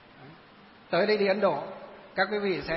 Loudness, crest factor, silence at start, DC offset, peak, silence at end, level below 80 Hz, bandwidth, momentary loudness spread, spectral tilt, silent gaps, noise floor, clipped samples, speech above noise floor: -27 LUFS; 18 dB; 0.2 s; under 0.1%; -12 dBFS; 0 s; -62 dBFS; 5.8 kHz; 14 LU; -9 dB/octave; none; -53 dBFS; under 0.1%; 27 dB